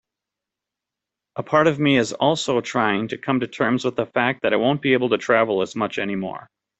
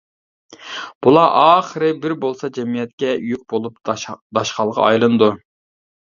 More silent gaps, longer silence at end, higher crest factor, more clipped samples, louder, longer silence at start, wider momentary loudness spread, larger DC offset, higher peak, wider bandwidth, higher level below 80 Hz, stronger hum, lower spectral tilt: second, none vs 0.95-1.01 s, 2.93-2.98 s, 4.21-4.30 s; second, 0.35 s vs 0.8 s; about the same, 18 dB vs 18 dB; neither; second, -21 LUFS vs -17 LUFS; first, 1.35 s vs 0.6 s; second, 8 LU vs 13 LU; neither; about the same, -2 dBFS vs 0 dBFS; first, 8.2 kHz vs 7.4 kHz; about the same, -62 dBFS vs -60 dBFS; neither; about the same, -5 dB/octave vs -5.5 dB/octave